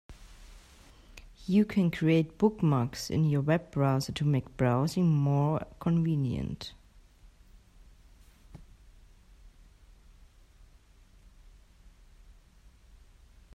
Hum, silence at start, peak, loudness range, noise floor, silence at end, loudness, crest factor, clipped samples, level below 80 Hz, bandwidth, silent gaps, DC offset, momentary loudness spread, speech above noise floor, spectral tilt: none; 0.1 s; -12 dBFS; 8 LU; -58 dBFS; 4.1 s; -28 LUFS; 18 dB; under 0.1%; -54 dBFS; 13.5 kHz; none; under 0.1%; 7 LU; 31 dB; -7.5 dB/octave